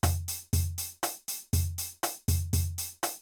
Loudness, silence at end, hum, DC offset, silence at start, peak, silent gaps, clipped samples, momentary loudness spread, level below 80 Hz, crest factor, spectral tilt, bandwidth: -32 LUFS; 0 s; none; under 0.1%; 0.05 s; -12 dBFS; none; under 0.1%; 5 LU; -44 dBFS; 18 dB; -4 dB/octave; over 20 kHz